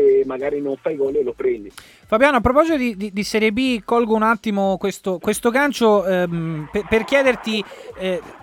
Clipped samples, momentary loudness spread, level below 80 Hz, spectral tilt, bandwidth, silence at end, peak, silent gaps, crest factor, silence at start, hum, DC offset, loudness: under 0.1%; 9 LU; -44 dBFS; -5 dB/octave; 17.5 kHz; 0.05 s; -2 dBFS; none; 16 dB; 0 s; none; under 0.1%; -19 LUFS